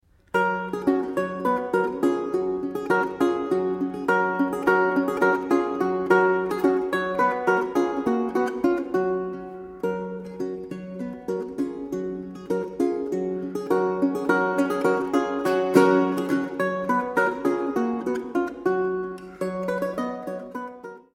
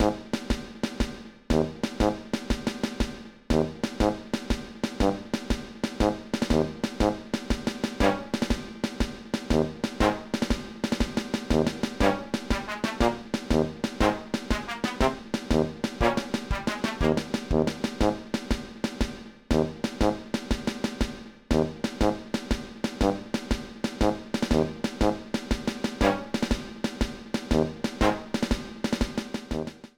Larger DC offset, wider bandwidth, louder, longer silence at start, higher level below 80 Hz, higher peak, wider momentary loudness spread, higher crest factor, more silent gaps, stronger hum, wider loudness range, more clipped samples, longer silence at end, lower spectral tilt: second, under 0.1% vs 0.1%; second, 15.5 kHz vs 19 kHz; first, -24 LUFS vs -28 LUFS; first, 0.35 s vs 0 s; second, -60 dBFS vs -36 dBFS; first, -2 dBFS vs -8 dBFS; first, 11 LU vs 7 LU; about the same, 22 dB vs 20 dB; neither; neither; first, 7 LU vs 2 LU; neither; about the same, 0.15 s vs 0.1 s; about the same, -6.5 dB/octave vs -5.5 dB/octave